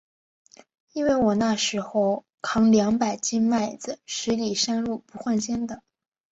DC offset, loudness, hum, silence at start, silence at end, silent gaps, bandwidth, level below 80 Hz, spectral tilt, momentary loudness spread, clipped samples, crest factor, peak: under 0.1%; -24 LUFS; none; 0.95 s; 0.55 s; 2.34-2.38 s; 8 kHz; -58 dBFS; -4 dB/octave; 11 LU; under 0.1%; 16 dB; -8 dBFS